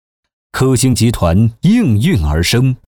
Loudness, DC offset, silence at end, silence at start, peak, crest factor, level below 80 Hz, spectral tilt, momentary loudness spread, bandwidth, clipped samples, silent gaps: -13 LUFS; under 0.1%; 0.15 s; 0.55 s; -4 dBFS; 10 dB; -26 dBFS; -5.5 dB/octave; 3 LU; 20 kHz; under 0.1%; none